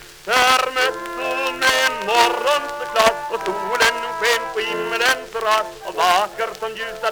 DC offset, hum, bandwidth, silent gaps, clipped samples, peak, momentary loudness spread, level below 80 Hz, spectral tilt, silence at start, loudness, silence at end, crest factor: under 0.1%; none; over 20 kHz; none; under 0.1%; 0 dBFS; 8 LU; -52 dBFS; -1 dB/octave; 0 s; -19 LUFS; 0 s; 18 dB